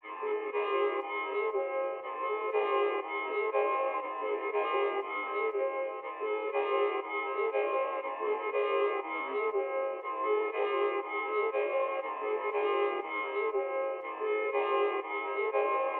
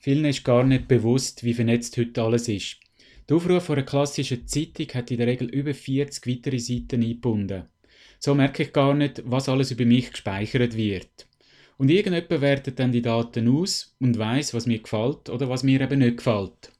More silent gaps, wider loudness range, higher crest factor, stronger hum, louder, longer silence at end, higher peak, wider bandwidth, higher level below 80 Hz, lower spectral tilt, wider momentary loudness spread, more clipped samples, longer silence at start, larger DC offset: neither; about the same, 1 LU vs 3 LU; about the same, 14 dB vs 16 dB; neither; second, -32 LUFS vs -24 LUFS; second, 0 s vs 0.15 s; second, -18 dBFS vs -8 dBFS; second, 4.1 kHz vs 13 kHz; second, under -90 dBFS vs -50 dBFS; second, 2.5 dB/octave vs -6 dB/octave; second, 5 LU vs 8 LU; neither; about the same, 0.05 s vs 0.05 s; neither